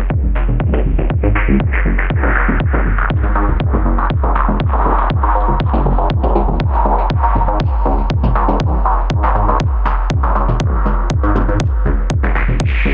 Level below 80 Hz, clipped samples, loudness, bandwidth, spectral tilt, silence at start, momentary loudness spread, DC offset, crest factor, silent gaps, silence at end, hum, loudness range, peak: -14 dBFS; under 0.1%; -15 LUFS; 7 kHz; -8 dB/octave; 0 s; 2 LU; under 0.1%; 12 dB; none; 0 s; none; 1 LU; 0 dBFS